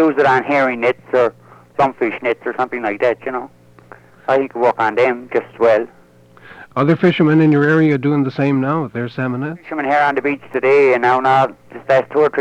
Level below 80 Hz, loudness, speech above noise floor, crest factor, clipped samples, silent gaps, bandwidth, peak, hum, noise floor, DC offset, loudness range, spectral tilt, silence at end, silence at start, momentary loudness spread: -60 dBFS; -16 LUFS; 30 dB; 14 dB; under 0.1%; none; 9 kHz; -2 dBFS; none; -46 dBFS; under 0.1%; 4 LU; -8 dB/octave; 0 s; 0 s; 10 LU